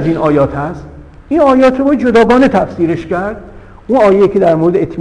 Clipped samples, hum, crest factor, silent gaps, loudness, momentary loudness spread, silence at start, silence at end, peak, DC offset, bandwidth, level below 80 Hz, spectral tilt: under 0.1%; none; 10 dB; none; -10 LUFS; 12 LU; 0 s; 0 s; 0 dBFS; under 0.1%; 10.5 kHz; -36 dBFS; -7.5 dB/octave